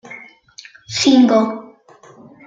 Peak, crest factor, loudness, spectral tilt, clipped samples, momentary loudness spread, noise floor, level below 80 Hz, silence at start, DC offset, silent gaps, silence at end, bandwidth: -2 dBFS; 16 dB; -14 LUFS; -4 dB/octave; under 0.1%; 24 LU; -45 dBFS; -60 dBFS; 0.1 s; under 0.1%; none; 0.85 s; 8.8 kHz